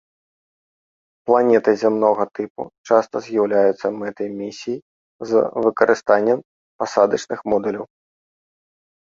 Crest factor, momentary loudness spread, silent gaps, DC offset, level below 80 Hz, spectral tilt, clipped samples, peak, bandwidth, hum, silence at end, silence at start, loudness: 20 dB; 14 LU; 2.50-2.55 s, 2.78-2.84 s, 4.82-5.19 s, 6.45-6.79 s; under 0.1%; -64 dBFS; -5.5 dB/octave; under 0.1%; 0 dBFS; 7.6 kHz; none; 1.3 s; 1.25 s; -19 LUFS